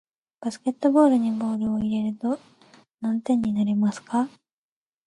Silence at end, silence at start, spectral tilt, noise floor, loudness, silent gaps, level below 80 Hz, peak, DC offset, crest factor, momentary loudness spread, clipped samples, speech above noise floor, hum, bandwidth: 0.8 s; 0.4 s; -7.5 dB/octave; under -90 dBFS; -24 LUFS; 2.94-2.98 s; -62 dBFS; -6 dBFS; under 0.1%; 18 dB; 13 LU; under 0.1%; over 67 dB; none; 11 kHz